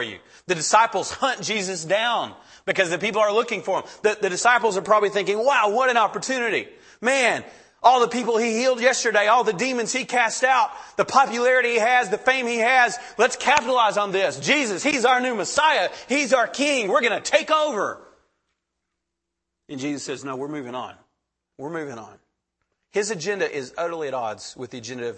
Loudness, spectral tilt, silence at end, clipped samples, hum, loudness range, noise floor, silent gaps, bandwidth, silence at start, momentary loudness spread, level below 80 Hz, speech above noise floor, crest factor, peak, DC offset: -21 LUFS; -2.5 dB/octave; 0 s; under 0.1%; none; 13 LU; -82 dBFS; none; 8.8 kHz; 0 s; 13 LU; -68 dBFS; 60 dB; 20 dB; -2 dBFS; under 0.1%